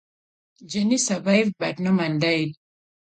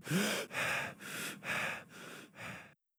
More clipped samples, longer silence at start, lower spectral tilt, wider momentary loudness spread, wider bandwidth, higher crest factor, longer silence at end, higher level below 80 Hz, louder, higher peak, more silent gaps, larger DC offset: neither; first, 0.6 s vs 0 s; about the same, -4.5 dB/octave vs -3.5 dB/octave; second, 6 LU vs 16 LU; second, 9.4 kHz vs over 20 kHz; about the same, 18 dB vs 18 dB; first, 0.55 s vs 0.3 s; first, -68 dBFS vs -76 dBFS; first, -22 LUFS vs -38 LUFS; first, -6 dBFS vs -22 dBFS; neither; neither